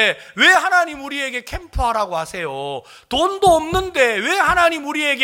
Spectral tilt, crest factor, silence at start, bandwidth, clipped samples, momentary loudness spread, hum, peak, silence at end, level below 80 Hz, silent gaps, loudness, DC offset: -3 dB/octave; 16 dB; 0 s; 17 kHz; under 0.1%; 13 LU; none; 0 dBFS; 0 s; -36 dBFS; none; -17 LUFS; under 0.1%